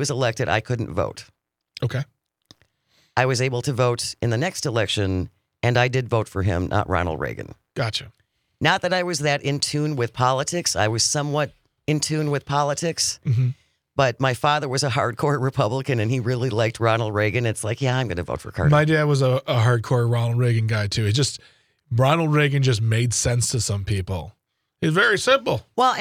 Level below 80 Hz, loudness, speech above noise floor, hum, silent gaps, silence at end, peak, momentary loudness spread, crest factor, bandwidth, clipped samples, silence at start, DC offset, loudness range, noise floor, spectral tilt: -50 dBFS; -22 LUFS; 43 dB; none; none; 0 s; -4 dBFS; 9 LU; 18 dB; 15.5 kHz; under 0.1%; 0 s; under 0.1%; 3 LU; -64 dBFS; -4.5 dB/octave